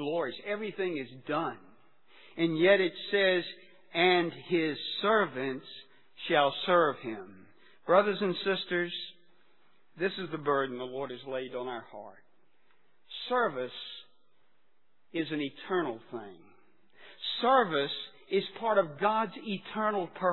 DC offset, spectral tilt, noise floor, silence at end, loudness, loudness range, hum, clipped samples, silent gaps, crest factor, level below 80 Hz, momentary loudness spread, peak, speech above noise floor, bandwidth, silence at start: 0.1%; -8 dB/octave; -76 dBFS; 0 s; -30 LUFS; 9 LU; none; under 0.1%; none; 24 dB; -80 dBFS; 18 LU; -8 dBFS; 46 dB; 4.3 kHz; 0 s